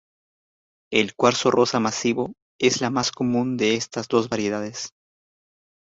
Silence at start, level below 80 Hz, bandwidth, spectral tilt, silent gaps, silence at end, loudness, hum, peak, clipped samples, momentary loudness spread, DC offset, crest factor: 0.9 s; -62 dBFS; 8 kHz; -4 dB/octave; 2.42-2.59 s; 0.95 s; -22 LUFS; none; -2 dBFS; under 0.1%; 9 LU; under 0.1%; 22 dB